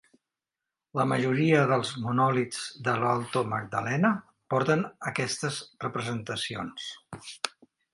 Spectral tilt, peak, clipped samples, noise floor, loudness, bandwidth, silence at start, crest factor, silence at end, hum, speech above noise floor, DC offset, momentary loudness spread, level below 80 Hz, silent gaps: -5.5 dB/octave; -8 dBFS; under 0.1%; -89 dBFS; -28 LUFS; 11.5 kHz; 0.95 s; 20 dB; 0.45 s; none; 61 dB; under 0.1%; 12 LU; -68 dBFS; none